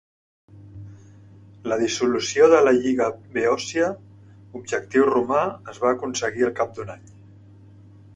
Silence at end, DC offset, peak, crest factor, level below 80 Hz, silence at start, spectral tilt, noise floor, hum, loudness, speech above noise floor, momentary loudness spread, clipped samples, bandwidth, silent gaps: 1.2 s; under 0.1%; -2 dBFS; 20 dB; -60 dBFS; 0.55 s; -4 dB/octave; -47 dBFS; none; -21 LUFS; 26 dB; 22 LU; under 0.1%; 10.5 kHz; none